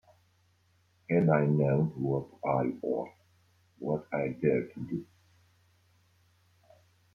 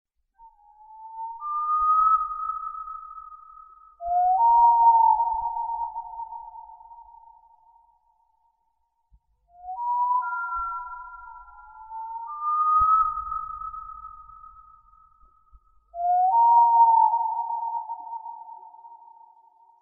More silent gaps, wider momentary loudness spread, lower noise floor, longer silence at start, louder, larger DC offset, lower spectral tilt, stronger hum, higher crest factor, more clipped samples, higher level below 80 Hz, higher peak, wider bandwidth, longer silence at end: neither; second, 13 LU vs 25 LU; second, -69 dBFS vs -73 dBFS; first, 1.1 s vs 0.9 s; second, -30 LUFS vs -22 LUFS; neither; first, -11 dB/octave vs 3 dB/octave; neither; first, 22 dB vs 16 dB; neither; second, -66 dBFS vs -56 dBFS; second, -12 dBFS vs -8 dBFS; first, 5.4 kHz vs 1.6 kHz; first, 2.1 s vs 0.85 s